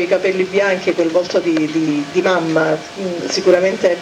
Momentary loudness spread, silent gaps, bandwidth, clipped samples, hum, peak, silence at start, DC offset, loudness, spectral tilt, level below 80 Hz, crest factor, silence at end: 6 LU; none; 11 kHz; under 0.1%; none; -2 dBFS; 0 s; under 0.1%; -16 LUFS; -5 dB/octave; -60 dBFS; 14 dB; 0 s